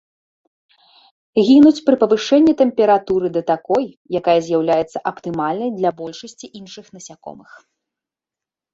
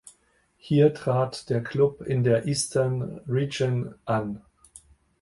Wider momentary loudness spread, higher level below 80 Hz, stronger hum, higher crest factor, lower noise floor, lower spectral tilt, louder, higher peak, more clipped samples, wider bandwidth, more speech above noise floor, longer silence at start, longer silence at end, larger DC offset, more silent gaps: first, 23 LU vs 8 LU; about the same, -58 dBFS vs -58 dBFS; neither; about the same, 16 dB vs 18 dB; first, -88 dBFS vs -65 dBFS; about the same, -6 dB/octave vs -6 dB/octave; first, -16 LUFS vs -25 LUFS; first, -2 dBFS vs -8 dBFS; neither; second, 7.8 kHz vs 11.5 kHz; first, 72 dB vs 41 dB; first, 1.35 s vs 0.05 s; first, 1.4 s vs 0.45 s; neither; first, 3.97-4.05 s vs none